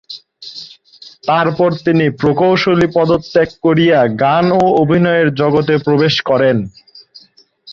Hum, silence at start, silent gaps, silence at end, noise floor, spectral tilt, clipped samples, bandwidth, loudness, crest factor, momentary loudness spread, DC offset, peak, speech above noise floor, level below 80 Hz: none; 0.1 s; none; 0 s; -47 dBFS; -7.5 dB/octave; under 0.1%; 7.4 kHz; -13 LUFS; 12 dB; 16 LU; under 0.1%; -2 dBFS; 35 dB; -48 dBFS